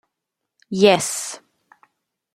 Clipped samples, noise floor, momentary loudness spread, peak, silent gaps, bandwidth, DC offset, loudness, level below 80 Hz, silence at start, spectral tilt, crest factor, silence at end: under 0.1%; -81 dBFS; 17 LU; -2 dBFS; none; 16 kHz; under 0.1%; -19 LUFS; -66 dBFS; 0.7 s; -3.5 dB/octave; 22 dB; 0.95 s